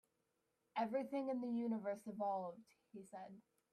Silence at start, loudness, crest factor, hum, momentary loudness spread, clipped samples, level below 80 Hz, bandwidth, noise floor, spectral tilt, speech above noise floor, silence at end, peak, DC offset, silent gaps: 0.75 s; -44 LUFS; 18 dB; none; 18 LU; under 0.1%; under -90 dBFS; 13.5 kHz; -86 dBFS; -7 dB/octave; 41 dB; 0.35 s; -28 dBFS; under 0.1%; none